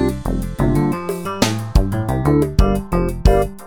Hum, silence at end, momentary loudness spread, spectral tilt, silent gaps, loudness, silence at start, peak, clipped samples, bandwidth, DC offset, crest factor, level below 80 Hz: none; 0 s; 7 LU; -6.5 dB/octave; none; -18 LUFS; 0 s; -2 dBFS; under 0.1%; 18 kHz; under 0.1%; 16 dB; -22 dBFS